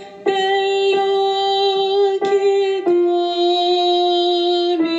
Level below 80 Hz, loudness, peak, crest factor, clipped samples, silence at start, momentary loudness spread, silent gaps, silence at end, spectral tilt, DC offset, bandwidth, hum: -70 dBFS; -17 LUFS; -4 dBFS; 12 dB; under 0.1%; 0 s; 2 LU; none; 0 s; -3.5 dB/octave; under 0.1%; 7.8 kHz; none